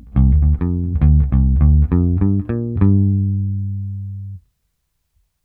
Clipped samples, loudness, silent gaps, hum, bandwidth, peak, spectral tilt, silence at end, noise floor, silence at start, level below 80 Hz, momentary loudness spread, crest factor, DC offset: under 0.1%; -16 LUFS; none; none; 2.6 kHz; -2 dBFS; -13.5 dB/octave; 1.05 s; -69 dBFS; 0.05 s; -20 dBFS; 13 LU; 14 dB; under 0.1%